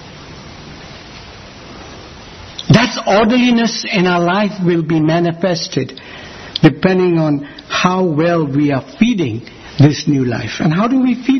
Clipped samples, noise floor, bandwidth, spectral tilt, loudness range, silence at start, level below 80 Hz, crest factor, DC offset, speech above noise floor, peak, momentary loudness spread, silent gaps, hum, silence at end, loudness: under 0.1%; -34 dBFS; 6.4 kHz; -6 dB/octave; 2 LU; 0 s; -44 dBFS; 14 dB; under 0.1%; 21 dB; 0 dBFS; 22 LU; none; none; 0 s; -14 LUFS